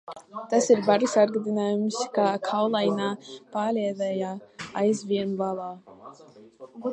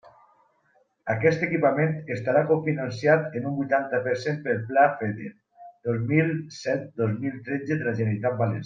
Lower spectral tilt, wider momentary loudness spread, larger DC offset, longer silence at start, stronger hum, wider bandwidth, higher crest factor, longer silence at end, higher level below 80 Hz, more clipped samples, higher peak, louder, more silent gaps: second, -5 dB/octave vs -7.5 dB/octave; first, 17 LU vs 9 LU; neither; second, 0.1 s vs 1.05 s; neither; first, 10.5 kHz vs 7.4 kHz; about the same, 20 dB vs 20 dB; about the same, 0 s vs 0 s; second, -74 dBFS vs -68 dBFS; neither; about the same, -6 dBFS vs -6 dBFS; about the same, -25 LUFS vs -25 LUFS; neither